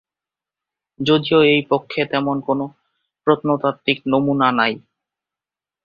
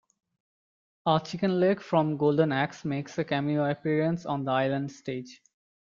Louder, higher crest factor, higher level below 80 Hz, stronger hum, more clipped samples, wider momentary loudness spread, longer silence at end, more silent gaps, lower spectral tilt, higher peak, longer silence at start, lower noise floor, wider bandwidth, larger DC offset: first, -18 LUFS vs -28 LUFS; about the same, 18 dB vs 20 dB; first, -60 dBFS vs -68 dBFS; neither; neither; about the same, 10 LU vs 10 LU; first, 1.05 s vs 0.5 s; neither; about the same, -7 dB/octave vs -7 dB/octave; first, -2 dBFS vs -8 dBFS; about the same, 1 s vs 1.05 s; about the same, -89 dBFS vs under -90 dBFS; about the same, 7 kHz vs 7.4 kHz; neither